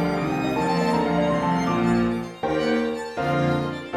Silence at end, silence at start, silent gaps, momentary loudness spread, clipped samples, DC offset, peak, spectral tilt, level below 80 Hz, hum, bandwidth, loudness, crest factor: 0 s; 0 s; none; 5 LU; under 0.1%; under 0.1%; -10 dBFS; -6.5 dB/octave; -48 dBFS; none; 13.5 kHz; -23 LUFS; 12 dB